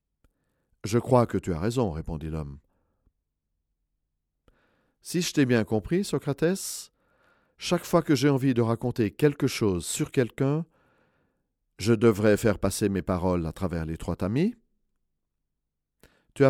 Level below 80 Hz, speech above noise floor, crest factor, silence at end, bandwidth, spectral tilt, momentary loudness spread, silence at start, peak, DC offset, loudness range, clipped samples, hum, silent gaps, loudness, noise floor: -50 dBFS; 57 dB; 20 dB; 0 s; 17 kHz; -6 dB/octave; 11 LU; 0.85 s; -6 dBFS; under 0.1%; 7 LU; under 0.1%; none; none; -26 LUFS; -82 dBFS